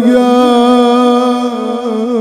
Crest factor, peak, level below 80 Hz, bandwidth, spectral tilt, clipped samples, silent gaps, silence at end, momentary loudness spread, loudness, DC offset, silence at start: 10 dB; 0 dBFS; -54 dBFS; 13 kHz; -5 dB/octave; under 0.1%; none; 0 s; 8 LU; -10 LUFS; under 0.1%; 0 s